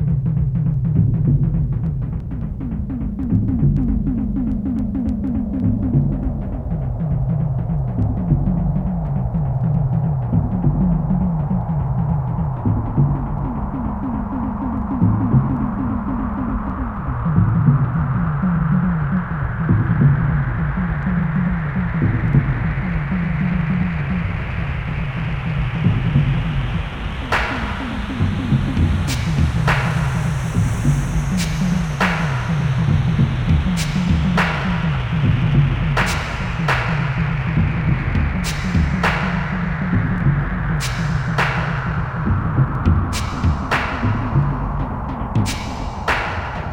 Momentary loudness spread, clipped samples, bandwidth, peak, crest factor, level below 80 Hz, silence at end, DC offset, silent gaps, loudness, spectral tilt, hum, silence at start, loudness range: 6 LU; under 0.1%; 15.5 kHz; -2 dBFS; 16 dB; -26 dBFS; 0 s; under 0.1%; none; -20 LUFS; -7 dB/octave; none; 0 s; 3 LU